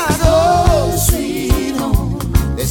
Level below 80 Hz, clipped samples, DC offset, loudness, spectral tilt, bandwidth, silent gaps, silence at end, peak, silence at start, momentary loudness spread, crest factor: -20 dBFS; under 0.1%; under 0.1%; -15 LUFS; -5.5 dB/octave; 18 kHz; none; 0 s; 0 dBFS; 0 s; 6 LU; 14 dB